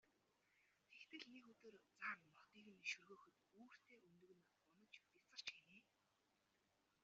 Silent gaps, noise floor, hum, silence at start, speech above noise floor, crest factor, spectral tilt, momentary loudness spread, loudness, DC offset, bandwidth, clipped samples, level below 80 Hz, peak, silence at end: none; -85 dBFS; none; 0.05 s; 26 dB; 26 dB; 0.5 dB/octave; 17 LU; -55 LUFS; under 0.1%; 7.4 kHz; under 0.1%; under -90 dBFS; -36 dBFS; 1.2 s